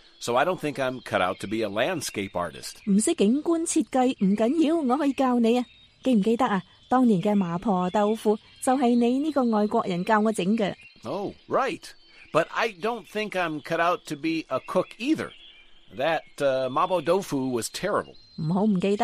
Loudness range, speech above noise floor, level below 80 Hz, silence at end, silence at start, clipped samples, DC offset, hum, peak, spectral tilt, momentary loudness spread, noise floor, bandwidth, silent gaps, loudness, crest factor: 4 LU; 25 dB; -60 dBFS; 0 s; 0.2 s; under 0.1%; under 0.1%; none; -6 dBFS; -5.5 dB/octave; 8 LU; -50 dBFS; 15 kHz; none; -25 LUFS; 18 dB